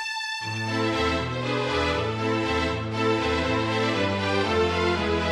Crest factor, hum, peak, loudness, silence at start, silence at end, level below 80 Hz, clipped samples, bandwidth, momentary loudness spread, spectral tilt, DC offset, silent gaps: 14 dB; none; -10 dBFS; -25 LUFS; 0 s; 0 s; -42 dBFS; under 0.1%; 12.5 kHz; 4 LU; -5 dB/octave; under 0.1%; none